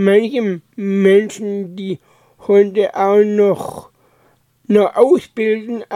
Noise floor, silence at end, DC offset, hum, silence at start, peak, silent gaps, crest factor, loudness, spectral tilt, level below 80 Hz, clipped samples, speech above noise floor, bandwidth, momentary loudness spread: -56 dBFS; 0 s; under 0.1%; none; 0 s; 0 dBFS; none; 16 dB; -15 LUFS; -7 dB/octave; -64 dBFS; under 0.1%; 42 dB; 12.5 kHz; 14 LU